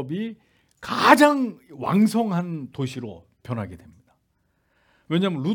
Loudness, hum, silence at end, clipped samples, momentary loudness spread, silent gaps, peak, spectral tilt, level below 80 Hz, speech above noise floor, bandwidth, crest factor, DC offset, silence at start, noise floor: -22 LUFS; none; 0 s; under 0.1%; 21 LU; none; 0 dBFS; -6 dB/octave; -66 dBFS; 47 dB; 18 kHz; 22 dB; under 0.1%; 0 s; -69 dBFS